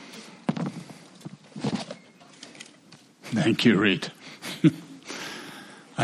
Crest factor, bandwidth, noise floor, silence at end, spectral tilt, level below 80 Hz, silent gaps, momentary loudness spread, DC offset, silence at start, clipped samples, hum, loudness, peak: 24 dB; 13.5 kHz; -53 dBFS; 0 s; -5.5 dB/octave; -72 dBFS; none; 24 LU; under 0.1%; 0 s; under 0.1%; none; -26 LUFS; -6 dBFS